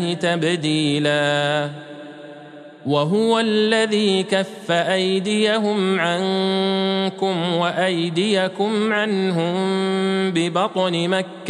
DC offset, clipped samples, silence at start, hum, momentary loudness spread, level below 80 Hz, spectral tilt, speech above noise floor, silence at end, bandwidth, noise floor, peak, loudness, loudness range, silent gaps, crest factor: under 0.1%; under 0.1%; 0 s; none; 5 LU; -72 dBFS; -5 dB/octave; 20 dB; 0 s; 11.5 kHz; -40 dBFS; -4 dBFS; -19 LUFS; 2 LU; none; 16 dB